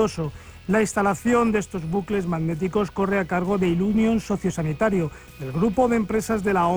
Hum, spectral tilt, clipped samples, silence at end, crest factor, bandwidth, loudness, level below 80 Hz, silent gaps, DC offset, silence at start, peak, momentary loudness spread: none; -6.5 dB/octave; under 0.1%; 0 s; 14 dB; over 20 kHz; -23 LUFS; -44 dBFS; none; under 0.1%; 0 s; -8 dBFS; 7 LU